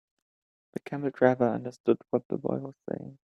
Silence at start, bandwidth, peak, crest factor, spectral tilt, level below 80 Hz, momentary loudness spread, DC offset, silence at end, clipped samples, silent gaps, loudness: 0.75 s; 9.6 kHz; -6 dBFS; 24 dB; -8.5 dB/octave; -70 dBFS; 14 LU; under 0.1%; 0.25 s; under 0.1%; 1.80-1.84 s, 2.25-2.30 s; -29 LUFS